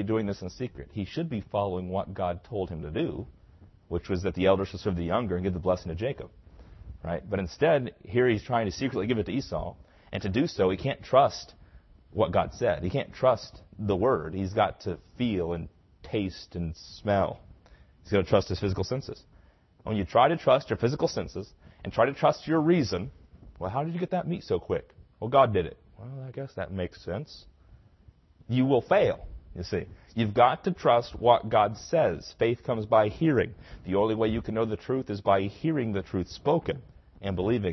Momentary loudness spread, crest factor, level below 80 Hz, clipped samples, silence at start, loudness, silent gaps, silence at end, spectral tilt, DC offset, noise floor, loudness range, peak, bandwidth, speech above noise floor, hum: 15 LU; 22 dB; -50 dBFS; under 0.1%; 0 s; -28 LUFS; none; 0 s; -7 dB/octave; under 0.1%; -58 dBFS; 5 LU; -6 dBFS; 6.2 kHz; 31 dB; none